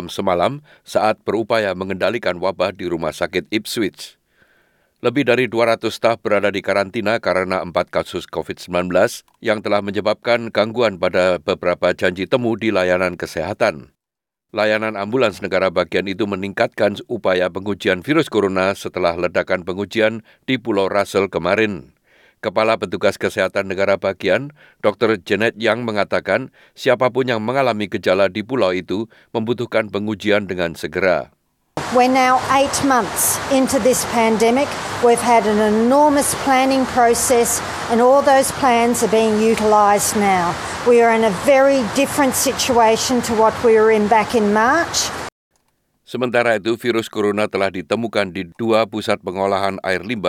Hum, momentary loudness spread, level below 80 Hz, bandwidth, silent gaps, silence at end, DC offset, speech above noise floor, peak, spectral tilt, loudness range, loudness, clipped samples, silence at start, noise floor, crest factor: none; 9 LU; -52 dBFS; 16.5 kHz; 45.32-45.51 s; 0 s; under 0.1%; 70 dB; -2 dBFS; -4 dB/octave; 5 LU; -17 LUFS; under 0.1%; 0 s; -87 dBFS; 16 dB